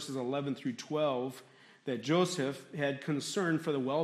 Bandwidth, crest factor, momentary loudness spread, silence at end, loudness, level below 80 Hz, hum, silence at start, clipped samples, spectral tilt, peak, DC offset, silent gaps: 14 kHz; 16 dB; 9 LU; 0 s; -34 LUFS; -80 dBFS; none; 0 s; under 0.1%; -5 dB/octave; -18 dBFS; under 0.1%; none